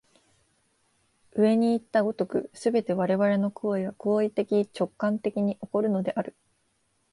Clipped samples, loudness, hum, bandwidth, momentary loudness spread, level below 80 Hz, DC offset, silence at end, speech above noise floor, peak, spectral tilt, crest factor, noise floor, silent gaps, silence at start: under 0.1%; -27 LUFS; none; 11.5 kHz; 6 LU; -72 dBFS; under 0.1%; 0.8 s; 46 dB; -10 dBFS; -7.5 dB/octave; 16 dB; -71 dBFS; none; 1.35 s